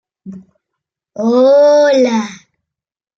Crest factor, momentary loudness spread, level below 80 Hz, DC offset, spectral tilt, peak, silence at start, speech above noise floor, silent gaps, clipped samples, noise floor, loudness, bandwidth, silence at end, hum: 12 dB; 16 LU; -68 dBFS; under 0.1%; -5 dB/octave; -2 dBFS; 0.25 s; 68 dB; none; under 0.1%; -79 dBFS; -11 LUFS; 7.4 kHz; 0.8 s; none